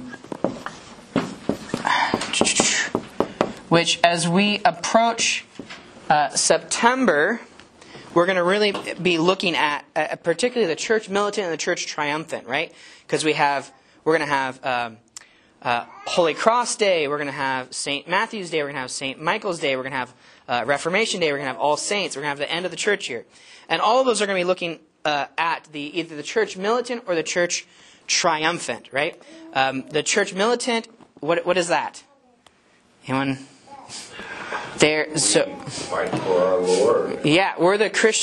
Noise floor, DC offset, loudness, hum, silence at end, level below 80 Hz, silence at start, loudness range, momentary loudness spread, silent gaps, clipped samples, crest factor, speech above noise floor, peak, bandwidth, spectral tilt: -58 dBFS; under 0.1%; -22 LUFS; none; 0 s; -62 dBFS; 0 s; 5 LU; 11 LU; none; under 0.1%; 22 dB; 36 dB; 0 dBFS; 11.5 kHz; -3 dB/octave